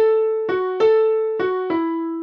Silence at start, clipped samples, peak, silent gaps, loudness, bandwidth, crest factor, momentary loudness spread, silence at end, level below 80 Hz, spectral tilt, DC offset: 0 s; under 0.1%; -6 dBFS; none; -19 LUFS; 5.6 kHz; 12 dB; 6 LU; 0 s; -66 dBFS; -6.5 dB/octave; under 0.1%